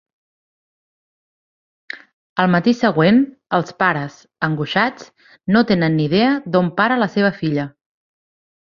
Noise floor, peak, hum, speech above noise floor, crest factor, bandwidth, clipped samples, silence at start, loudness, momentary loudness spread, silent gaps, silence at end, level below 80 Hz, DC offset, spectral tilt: under -90 dBFS; 0 dBFS; none; over 73 dB; 18 dB; 7.2 kHz; under 0.1%; 1.95 s; -17 LUFS; 16 LU; 2.13-2.36 s; 1.05 s; -58 dBFS; under 0.1%; -7 dB/octave